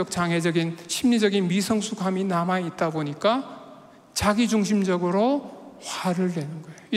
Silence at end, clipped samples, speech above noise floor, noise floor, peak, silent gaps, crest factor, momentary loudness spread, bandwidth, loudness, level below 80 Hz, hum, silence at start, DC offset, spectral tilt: 0 s; under 0.1%; 24 dB; -48 dBFS; -8 dBFS; none; 16 dB; 12 LU; 15.5 kHz; -24 LUFS; -54 dBFS; none; 0 s; under 0.1%; -5 dB/octave